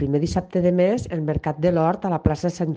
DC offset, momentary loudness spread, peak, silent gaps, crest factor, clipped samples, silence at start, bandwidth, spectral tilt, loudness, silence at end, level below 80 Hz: under 0.1%; 6 LU; -4 dBFS; none; 18 dB; under 0.1%; 0 s; 9 kHz; -8 dB/octave; -22 LUFS; 0 s; -40 dBFS